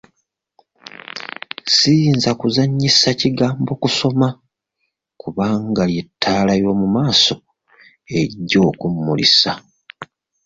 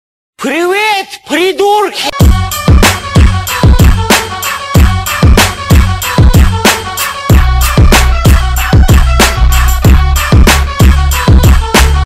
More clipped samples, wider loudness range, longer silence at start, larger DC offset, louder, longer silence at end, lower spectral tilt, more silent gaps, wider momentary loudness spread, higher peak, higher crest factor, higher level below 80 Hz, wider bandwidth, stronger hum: second, under 0.1% vs 0.4%; first, 4 LU vs 1 LU; first, 1.15 s vs 0.4 s; neither; second, -16 LUFS vs -8 LUFS; first, 0.4 s vs 0 s; about the same, -4.5 dB/octave vs -4.5 dB/octave; neither; first, 17 LU vs 5 LU; about the same, -2 dBFS vs 0 dBFS; first, 16 dB vs 6 dB; second, -50 dBFS vs -10 dBFS; second, 7.8 kHz vs 16.5 kHz; neither